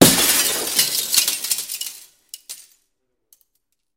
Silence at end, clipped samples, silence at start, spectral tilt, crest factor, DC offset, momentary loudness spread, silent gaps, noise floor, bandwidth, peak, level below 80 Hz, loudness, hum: 1.35 s; under 0.1%; 0 s; -2 dB/octave; 22 dB; under 0.1%; 23 LU; none; -73 dBFS; 17 kHz; 0 dBFS; -54 dBFS; -17 LUFS; none